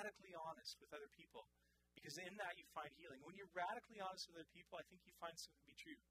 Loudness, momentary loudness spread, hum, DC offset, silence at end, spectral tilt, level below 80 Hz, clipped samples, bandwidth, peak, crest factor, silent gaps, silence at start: -55 LUFS; 12 LU; none; under 0.1%; 0.1 s; -2.5 dB/octave; -84 dBFS; under 0.1%; 15.5 kHz; -34 dBFS; 22 dB; none; 0 s